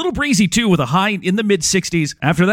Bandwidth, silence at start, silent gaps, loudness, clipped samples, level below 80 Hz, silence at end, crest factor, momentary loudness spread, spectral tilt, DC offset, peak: 16.5 kHz; 0 s; none; -16 LUFS; under 0.1%; -42 dBFS; 0 s; 14 dB; 4 LU; -4.5 dB/octave; under 0.1%; -2 dBFS